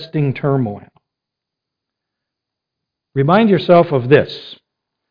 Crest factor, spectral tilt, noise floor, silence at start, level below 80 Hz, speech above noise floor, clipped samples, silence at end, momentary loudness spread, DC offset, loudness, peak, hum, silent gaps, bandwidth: 18 dB; -9.5 dB/octave; -82 dBFS; 0 s; -54 dBFS; 68 dB; under 0.1%; 0.55 s; 14 LU; under 0.1%; -14 LUFS; 0 dBFS; none; none; 5.2 kHz